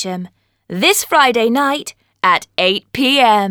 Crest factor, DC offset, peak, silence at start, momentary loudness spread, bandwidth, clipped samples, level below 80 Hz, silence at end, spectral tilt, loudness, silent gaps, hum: 14 dB; under 0.1%; 0 dBFS; 0 s; 16 LU; over 20 kHz; under 0.1%; -58 dBFS; 0 s; -2.5 dB/octave; -14 LUFS; none; none